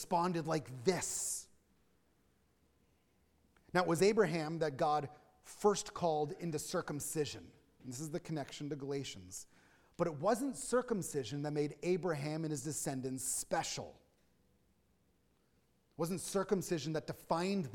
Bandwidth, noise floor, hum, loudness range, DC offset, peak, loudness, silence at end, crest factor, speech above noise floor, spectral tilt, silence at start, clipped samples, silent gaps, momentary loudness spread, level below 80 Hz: 17.5 kHz; -75 dBFS; none; 7 LU; under 0.1%; -16 dBFS; -37 LUFS; 0 s; 22 dB; 38 dB; -4.5 dB/octave; 0 s; under 0.1%; none; 9 LU; -68 dBFS